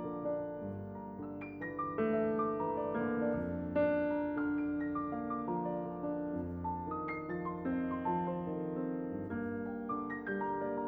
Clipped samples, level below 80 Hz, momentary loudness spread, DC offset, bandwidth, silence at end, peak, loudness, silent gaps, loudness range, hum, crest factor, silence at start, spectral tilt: under 0.1%; -62 dBFS; 8 LU; under 0.1%; 4.6 kHz; 0 s; -22 dBFS; -37 LUFS; none; 3 LU; none; 16 dB; 0 s; -11 dB/octave